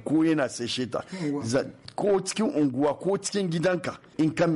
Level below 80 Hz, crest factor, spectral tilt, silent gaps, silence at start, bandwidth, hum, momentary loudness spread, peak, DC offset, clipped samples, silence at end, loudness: -62 dBFS; 10 dB; -5 dB/octave; none; 0 s; 11.5 kHz; none; 7 LU; -16 dBFS; under 0.1%; under 0.1%; 0 s; -27 LUFS